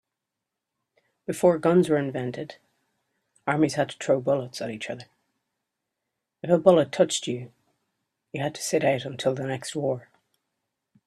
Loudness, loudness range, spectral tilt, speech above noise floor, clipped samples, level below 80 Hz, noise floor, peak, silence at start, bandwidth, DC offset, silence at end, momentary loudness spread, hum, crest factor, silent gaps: -25 LUFS; 4 LU; -5.5 dB/octave; 61 dB; under 0.1%; -68 dBFS; -85 dBFS; -4 dBFS; 1.3 s; 13.5 kHz; under 0.1%; 1.05 s; 15 LU; none; 24 dB; none